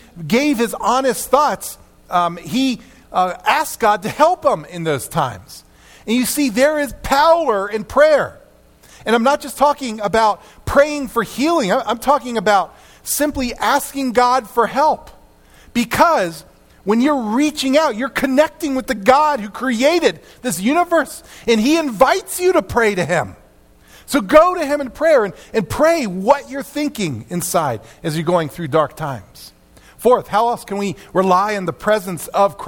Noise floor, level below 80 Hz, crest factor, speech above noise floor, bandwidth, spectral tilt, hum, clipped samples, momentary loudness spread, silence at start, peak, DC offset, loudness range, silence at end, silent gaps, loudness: -48 dBFS; -44 dBFS; 18 dB; 32 dB; 18 kHz; -4.5 dB/octave; none; under 0.1%; 9 LU; 0.15 s; 0 dBFS; under 0.1%; 3 LU; 0 s; none; -17 LUFS